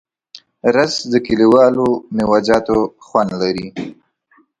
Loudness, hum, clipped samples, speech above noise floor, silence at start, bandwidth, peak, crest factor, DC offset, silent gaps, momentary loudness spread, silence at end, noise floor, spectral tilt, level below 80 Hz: -15 LUFS; none; under 0.1%; 41 dB; 0.35 s; 11 kHz; 0 dBFS; 16 dB; under 0.1%; none; 11 LU; 0.65 s; -56 dBFS; -5.5 dB/octave; -48 dBFS